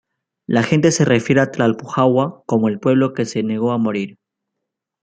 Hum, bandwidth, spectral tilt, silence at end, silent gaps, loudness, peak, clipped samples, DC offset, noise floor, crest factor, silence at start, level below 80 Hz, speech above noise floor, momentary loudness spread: none; 9.4 kHz; -6 dB/octave; 0.95 s; none; -17 LUFS; -2 dBFS; under 0.1%; under 0.1%; -80 dBFS; 16 dB; 0.5 s; -58 dBFS; 63 dB; 7 LU